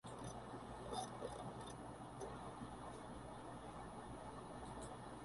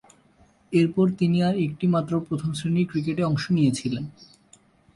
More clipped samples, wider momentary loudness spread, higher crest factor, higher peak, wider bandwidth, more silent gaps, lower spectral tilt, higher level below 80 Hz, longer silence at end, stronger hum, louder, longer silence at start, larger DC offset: neither; about the same, 5 LU vs 7 LU; about the same, 18 dB vs 16 dB; second, -34 dBFS vs -10 dBFS; about the same, 11.5 kHz vs 11.5 kHz; neither; second, -5 dB/octave vs -7 dB/octave; second, -64 dBFS vs -58 dBFS; second, 0 s vs 0.7 s; neither; second, -52 LUFS vs -24 LUFS; second, 0.05 s vs 0.7 s; neither